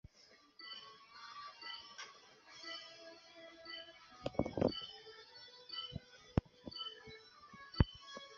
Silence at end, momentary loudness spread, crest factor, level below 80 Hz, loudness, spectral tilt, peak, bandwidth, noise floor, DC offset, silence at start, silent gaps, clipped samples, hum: 0 s; 19 LU; 30 dB; -52 dBFS; -44 LUFS; -4.5 dB/octave; -14 dBFS; 7.2 kHz; -66 dBFS; under 0.1%; 0.15 s; none; under 0.1%; none